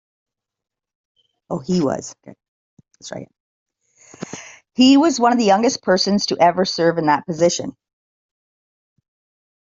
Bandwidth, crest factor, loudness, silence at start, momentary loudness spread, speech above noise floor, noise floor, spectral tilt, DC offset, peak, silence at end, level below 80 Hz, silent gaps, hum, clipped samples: 7.8 kHz; 18 dB; -17 LUFS; 1.5 s; 21 LU; over 73 dB; under -90 dBFS; -4.5 dB/octave; under 0.1%; -2 dBFS; 2 s; -62 dBFS; 2.48-2.77 s, 3.40-3.66 s; none; under 0.1%